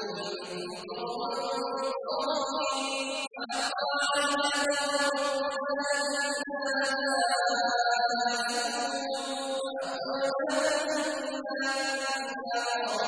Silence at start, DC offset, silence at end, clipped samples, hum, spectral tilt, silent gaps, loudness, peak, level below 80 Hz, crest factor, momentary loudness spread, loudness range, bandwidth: 0 s; under 0.1%; 0 s; under 0.1%; none; -1 dB/octave; none; -29 LUFS; -14 dBFS; -74 dBFS; 16 dB; 7 LU; 3 LU; 11 kHz